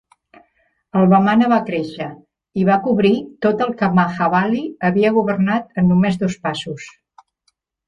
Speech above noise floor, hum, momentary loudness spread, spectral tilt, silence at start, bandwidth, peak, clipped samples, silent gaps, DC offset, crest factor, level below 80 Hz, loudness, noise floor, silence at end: 51 dB; none; 13 LU; -7.5 dB/octave; 0.95 s; 8.6 kHz; -2 dBFS; under 0.1%; none; under 0.1%; 16 dB; -54 dBFS; -17 LUFS; -67 dBFS; 1 s